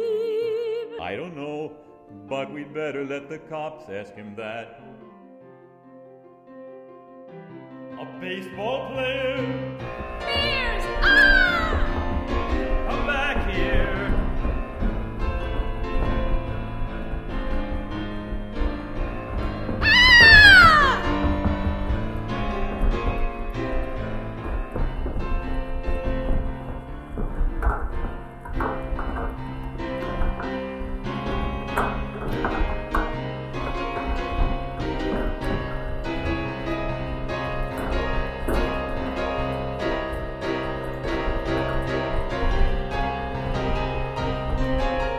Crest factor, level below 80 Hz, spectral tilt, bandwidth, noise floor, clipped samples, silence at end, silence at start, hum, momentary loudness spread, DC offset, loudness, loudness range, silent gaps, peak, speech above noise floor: 22 dB; -30 dBFS; -5 dB/octave; 13 kHz; -48 dBFS; under 0.1%; 0 s; 0 s; none; 11 LU; under 0.1%; -23 LUFS; 18 LU; none; 0 dBFS; 18 dB